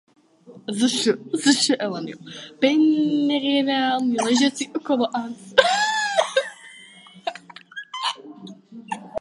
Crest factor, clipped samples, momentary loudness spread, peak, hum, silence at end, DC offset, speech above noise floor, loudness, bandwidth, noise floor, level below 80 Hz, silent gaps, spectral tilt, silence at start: 22 dB; under 0.1%; 19 LU; 0 dBFS; none; 0 s; under 0.1%; 27 dB; -21 LUFS; 11.5 kHz; -48 dBFS; -70 dBFS; none; -3 dB/octave; 0.5 s